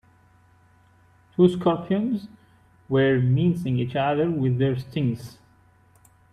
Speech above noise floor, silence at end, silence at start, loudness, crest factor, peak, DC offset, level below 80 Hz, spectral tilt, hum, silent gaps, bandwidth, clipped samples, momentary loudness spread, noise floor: 35 dB; 1 s; 1.4 s; -23 LUFS; 20 dB; -6 dBFS; under 0.1%; -58 dBFS; -8.5 dB/octave; none; none; 10 kHz; under 0.1%; 9 LU; -57 dBFS